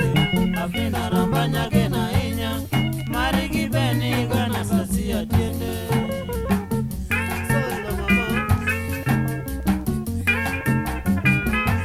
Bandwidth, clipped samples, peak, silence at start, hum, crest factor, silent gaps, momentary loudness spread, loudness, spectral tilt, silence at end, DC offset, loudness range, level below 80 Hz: 16 kHz; under 0.1%; -6 dBFS; 0 s; none; 16 dB; none; 5 LU; -22 LUFS; -6 dB/octave; 0 s; under 0.1%; 1 LU; -34 dBFS